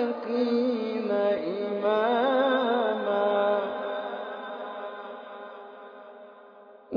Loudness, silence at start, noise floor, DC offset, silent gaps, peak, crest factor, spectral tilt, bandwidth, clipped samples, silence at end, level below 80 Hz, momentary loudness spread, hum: -27 LUFS; 0 s; -51 dBFS; under 0.1%; none; -12 dBFS; 16 dB; -7 dB/octave; 5.4 kHz; under 0.1%; 0 s; -82 dBFS; 20 LU; none